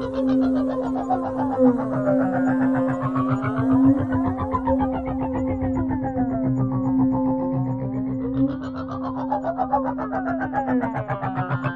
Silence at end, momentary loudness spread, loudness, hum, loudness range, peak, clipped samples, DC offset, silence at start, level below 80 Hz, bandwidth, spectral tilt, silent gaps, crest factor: 0 s; 7 LU; -23 LUFS; none; 4 LU; -6 dBFS; under 0.1%; 0.1%; 0 s; -44 dBFS; 4.5 kHz; -10 dB/octave; none; 16 dB